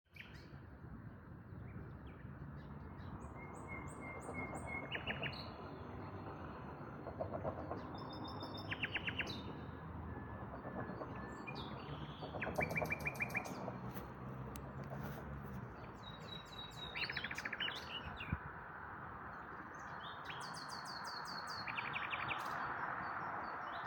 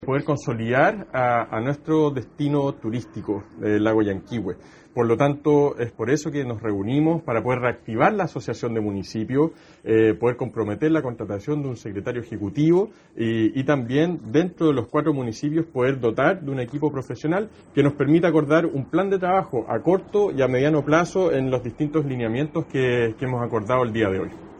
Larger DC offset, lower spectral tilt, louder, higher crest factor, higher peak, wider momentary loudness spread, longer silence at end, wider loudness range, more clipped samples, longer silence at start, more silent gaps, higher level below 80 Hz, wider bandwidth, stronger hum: neither; second, -5 dB/octave vs -7.5 dB/octave; second, -46 LUFS vs -23 LUFS; about the same, 22 dB vs 18 dB; second, -24 dBFS vs -4 dBFS; about the same, 11 LU vs 9 LU; about the same, 0 s vs 0 s; first, 6 LU vs 3 LU; neither; about the same, 0.1 s vs 0 s; neither; second, -62 dBFS vs -54 dBFS; first, 17 kHz vs 9 kHz; neither